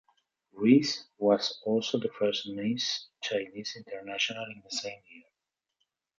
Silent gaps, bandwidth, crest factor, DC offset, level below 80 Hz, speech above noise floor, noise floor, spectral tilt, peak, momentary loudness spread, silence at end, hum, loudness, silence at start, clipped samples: none; 7.6 kHz; 22 dB; under 0.1%; -76 dBFS; 58 dB; -87 dBFS; -4.5 dB/octave; -8 dBFS; 15 LU; 1 s; none; -30 LUFS; 0.55 s; under 0.1%